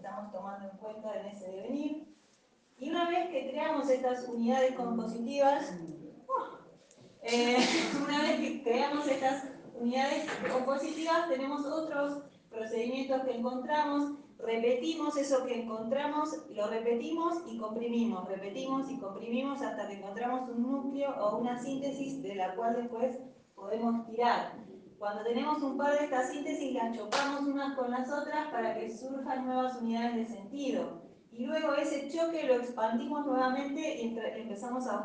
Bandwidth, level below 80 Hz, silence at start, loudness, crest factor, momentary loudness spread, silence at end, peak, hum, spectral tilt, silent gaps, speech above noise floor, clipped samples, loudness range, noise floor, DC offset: 9.8 kHz; -78 dBFS; 0 s; -33 LUFS; 18 dB; 11 LU; 0 s; -16 dBFS; none; -4 dB/octave; none; 34 dB; under 0.1%; 4 LU; -67 dBFS; under 0.1%